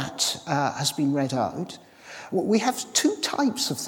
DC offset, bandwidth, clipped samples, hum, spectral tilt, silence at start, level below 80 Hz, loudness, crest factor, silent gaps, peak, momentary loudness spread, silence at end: under 0.1%; 18 kHz; under 0.1%; none; -3.5 dB/octave; 0 s; -70 dBFS; -25 LUFS; 18 dB; none; -6 dBFS; 13 LU; 0 s